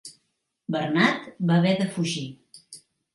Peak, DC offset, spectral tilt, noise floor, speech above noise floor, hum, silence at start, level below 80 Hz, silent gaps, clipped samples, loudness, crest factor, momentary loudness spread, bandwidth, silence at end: -6 dBFS; under 0.1%; -5.5 dB/octave; -76 dBFS; 52 dB; none; 0.05 s; -70 dBFS; none; under 0.1%; -24 LUFS; 20 dB; 23 LU; 11.5 kHz; 0.35 s